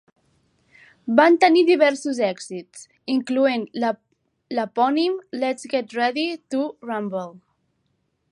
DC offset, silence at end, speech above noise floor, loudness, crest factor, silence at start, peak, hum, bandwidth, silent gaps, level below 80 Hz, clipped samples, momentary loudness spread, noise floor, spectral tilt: under 0.1%; 0.95 s; 50 dB; -21 LUFS; 22 dB; 1.05 s; -2 dBFS; none; 11 kHz; none; -76 dBFS; under 0.1%; 17 LU; -71 dBFS; -4.5 dB/octave